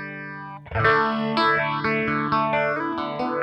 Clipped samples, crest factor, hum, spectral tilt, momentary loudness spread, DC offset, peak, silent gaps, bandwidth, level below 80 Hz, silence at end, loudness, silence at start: under 0.1%; 20 dB; none; -7 dB/octave; 14 LU; under 0.1%; -4 dBFS; none; 9.2 kHz; -50 dBFS; 0 s; -22 LUFS; 0 s